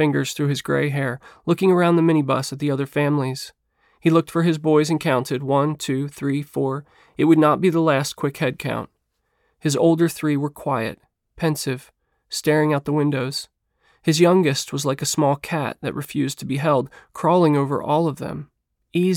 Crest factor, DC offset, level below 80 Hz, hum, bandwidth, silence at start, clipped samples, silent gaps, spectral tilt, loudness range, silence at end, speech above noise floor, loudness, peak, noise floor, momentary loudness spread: 16 dB; under 0.1%; -60 dBFS; none; 17.5 kHz; 0 s; under 0.1%; none; -6 dB/octave; 3 LU; 0 s; 51 dB; -21 LUFS; -4 dBFS; -71 dBFS; 11 LU